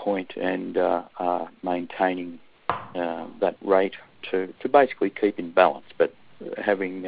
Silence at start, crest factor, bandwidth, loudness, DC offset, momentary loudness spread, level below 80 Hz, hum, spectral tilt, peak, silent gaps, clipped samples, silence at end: 0 s; 22 dB; 5 kHz; -25 LUFS; under 0.1%; 11 LU; -66 dBFS; none; -10 dB/octave; -2 dBFS; none; under 0.1%; 0 s